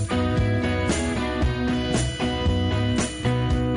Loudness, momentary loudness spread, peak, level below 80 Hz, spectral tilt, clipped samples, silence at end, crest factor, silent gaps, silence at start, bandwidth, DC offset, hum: -24 LUFS; 2 LU; -12 dBFS; -32 dBFS; -5.5 dB/octave; under 0.1%; 0 s; 10 dB; none; 0 s; 11 kHz; under 0.1%; none